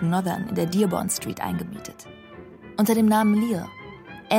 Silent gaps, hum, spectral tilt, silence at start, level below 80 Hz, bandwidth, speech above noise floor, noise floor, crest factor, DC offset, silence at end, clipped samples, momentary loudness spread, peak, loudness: none; none; -5.5 dB/octave; 0 s; -56 dBFS; 16.5 kHz; 21 dB; -44 dBFS; 18 dB; under 0.1%; 0 s; under 0.1%; 24 LU; -6 dBFS; -23 LUFS